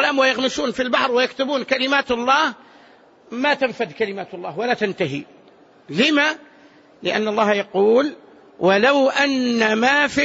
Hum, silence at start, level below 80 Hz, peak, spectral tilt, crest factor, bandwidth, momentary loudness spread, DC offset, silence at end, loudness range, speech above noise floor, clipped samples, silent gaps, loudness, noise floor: none; 0 s; -60 dBFS; -4 dBFS; -4 dB/octave; 16 dB; 8 kHz; 10 LU; under 0.1%; 0 s; 5 LU; 31 dB; under 0.1%; none; -19 LUFS; -50 dBFS